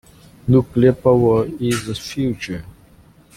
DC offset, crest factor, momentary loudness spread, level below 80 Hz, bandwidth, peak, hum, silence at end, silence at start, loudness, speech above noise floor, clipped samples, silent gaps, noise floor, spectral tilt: under 0.1%; 16 dB; 14 LU; -44 dBFS; 15 kHz; -2 dBFS; none; 0.65 s; 0.45 s; -18 LUFS; 32 dB; under 0.1%; none; -49 dBFS; -7 dB/octave